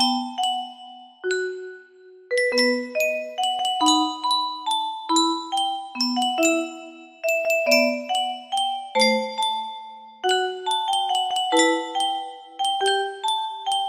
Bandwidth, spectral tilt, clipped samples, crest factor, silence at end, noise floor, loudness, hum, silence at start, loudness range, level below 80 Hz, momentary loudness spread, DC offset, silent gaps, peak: 15.5 kHz; -1 dB/octave; under 0.1%; 20 dB; 0 s; -48 dBFS; -22 LUFS; none; 0 s; 2 LU; -76 dBFS; 12 LU; under 0.1%; none; -4 dBFS